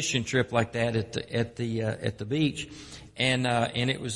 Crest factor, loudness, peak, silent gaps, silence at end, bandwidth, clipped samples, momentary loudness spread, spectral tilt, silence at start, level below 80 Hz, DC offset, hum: 18 dB; -28 LUFS; -10 dBFS; none; 0 s; 11.5 kHz; under 0.1%; 9 LU; -4.5 dB/octave; 0 s; -56 dBFS; under 0.1%; none